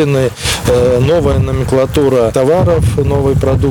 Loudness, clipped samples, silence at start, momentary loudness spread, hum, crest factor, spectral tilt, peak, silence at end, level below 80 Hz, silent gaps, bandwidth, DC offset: -12 LUFS; under 0.1%; 0 s; 3 LU; none; 10 dB; -6 dB/octave; 0 dBFS; 0 s; -24 dBFS; none; 19.5 kHz; under 0.1%